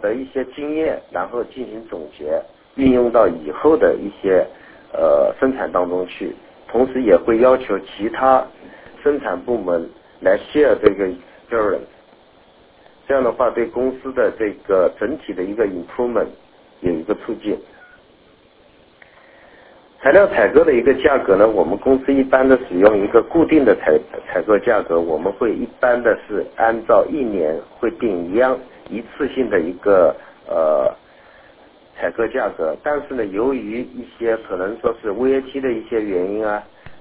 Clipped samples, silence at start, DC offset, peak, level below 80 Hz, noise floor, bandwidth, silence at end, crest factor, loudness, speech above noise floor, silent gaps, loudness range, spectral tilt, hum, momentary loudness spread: under 0.1%; 0 s; under 0.1%; 0 dBFS; -48 dBFS; -51 dBFS; 4 kHz; 0 s; 18 dB; -18 LUFS; 34 dB; none; 8 LU; -10 dB/octave; none; 12 LU